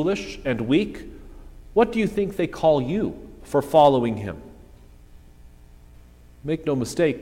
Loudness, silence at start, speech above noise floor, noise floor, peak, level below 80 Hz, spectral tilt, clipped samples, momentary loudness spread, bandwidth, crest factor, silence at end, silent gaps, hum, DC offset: -22 LUFS; 0 s; 26 dB; -48 dBFS; -4 dBFS; -46 dBFS; -6.5 dB/octave; under 0.1%; 18 LU; 16.5 kHz; 20 dB; 0 s; none; none; under 0.1%